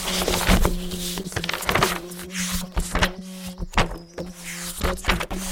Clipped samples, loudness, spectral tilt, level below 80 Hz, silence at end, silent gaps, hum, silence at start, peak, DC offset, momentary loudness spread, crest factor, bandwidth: under 0.1%; -25 LUFS; -3.5 dB/octave; -30 dBFS; 0 s; none; none; 0 s; -4 dBFS; under 0.1%; 13 LU; 22 dB; 17 kHz